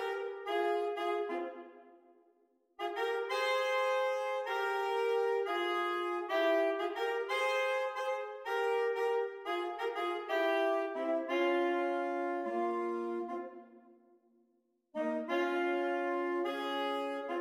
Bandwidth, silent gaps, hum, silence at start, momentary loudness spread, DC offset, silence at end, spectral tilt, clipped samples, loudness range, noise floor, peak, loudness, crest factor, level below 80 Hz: 16 kHz; none; none; 0 s; 7 LU; under 0.1%; 0 s; -2.5 dB/octave; under 0.1%; 5 LU; -76 dBFS; -20 dBFS; -34 LUFS; 14 dB; -88 dBFS